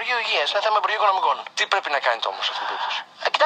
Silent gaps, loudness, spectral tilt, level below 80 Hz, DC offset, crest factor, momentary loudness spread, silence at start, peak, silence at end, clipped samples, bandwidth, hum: none; -22 LUFS; 1 dB/octave; -88 dBFS; under 0.1%; 20 dB; 6 LU; 0 s; -4 dBFS; 0 s; under 0.1%; 9.2 kHz; none